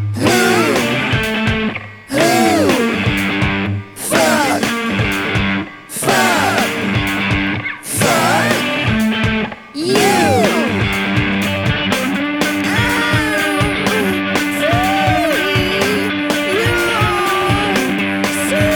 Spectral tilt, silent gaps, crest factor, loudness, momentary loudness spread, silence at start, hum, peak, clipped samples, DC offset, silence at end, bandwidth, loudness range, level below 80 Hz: -4.5 dB/octave; none; 16 dB; -15 LUFS; 5 LU; 0 s; none; 0 dBFS; under 0.1%; under 0.1%; 0 s; over 20 kHz; 1 LU; -36 dBFS